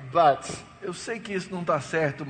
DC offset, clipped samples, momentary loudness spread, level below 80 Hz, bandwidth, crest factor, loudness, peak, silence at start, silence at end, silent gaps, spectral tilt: under 0.1%; under 0.1%; 15 LU; -60 dBFS; 9.4 kHz; 18 dB; -27 LUFS; -8 dBFS; 0 s; 0 s; none; -5 dB/octave